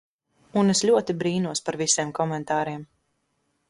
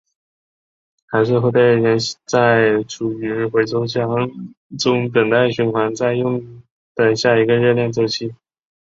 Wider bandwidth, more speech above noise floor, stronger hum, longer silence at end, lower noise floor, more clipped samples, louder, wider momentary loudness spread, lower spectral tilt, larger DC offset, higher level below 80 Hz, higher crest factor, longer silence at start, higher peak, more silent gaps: first, 11.5 kHz vs 7.8 kHz; second, 49 dB vs over 73 dB; neither; first, 0.85 s vs 0.5 s; second, -73 dBFS vs under -90 dBFS; neither; second, -24 LUFS vs -17 LUFS; about the same, 8 LU vs 10 LU; second, -4 dB/octave vs -5.5 dB/octave; neither; second, -64 dBFS vs -58 dBFS; about the same, 18 dB vs 16 dB; second, 0.55 s vs 1.1 s; second, -8 dBFS vs -2 dBFS; second, none vs 4.57-4.70 s, 6.71-6.95 s